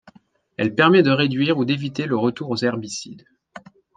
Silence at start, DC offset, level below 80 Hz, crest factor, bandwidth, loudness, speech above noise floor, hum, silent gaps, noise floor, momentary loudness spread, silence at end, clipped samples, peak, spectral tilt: 0.6 s; under 0.1%; -64 dBFS; 20 dB; 9.4 kHz; -20 LUFS; 33 dB; none; none; -53 dBFS; 16 LU; 0.4 s; under 0.1%; -2 dBFS; -5.5 dB/octave